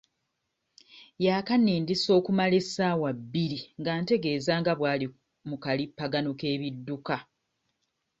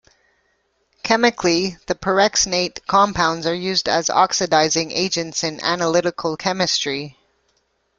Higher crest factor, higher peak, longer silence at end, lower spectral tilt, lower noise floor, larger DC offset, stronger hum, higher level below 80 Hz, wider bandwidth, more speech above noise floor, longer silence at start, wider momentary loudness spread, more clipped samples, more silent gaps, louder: about the same, 18 dB vs 18 dB; second, -12 dBFS vs -2 dBFS; about the same, 1 s vs 0.9 s; first, -6 dB/octave vs -2.5 dB/octave; first, -80 dBFS vs -66 dBFS; neither; neither; second, -66 dBFS vs -52 dBFS; second, 8.2 kHz vs 11 kHz; first, 53 dB vs 47 dB; about the same, 0.95 s vs 1.05 s; first, 10 LU vs 7 LU; neither; neither; second, -28 LUFS vs -19 LUFS